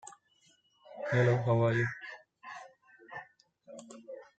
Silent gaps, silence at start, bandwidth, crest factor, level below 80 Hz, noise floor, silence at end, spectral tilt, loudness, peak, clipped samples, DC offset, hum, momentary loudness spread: none; 0.05 s; 9 kHz; 18 dB; -74 dBFS; -69 dBFS; 0.15 s; -7.5 dB/octave; -30 LUFS; -16 dBFS; under 0.1%; under 0.1%; none; 24 LU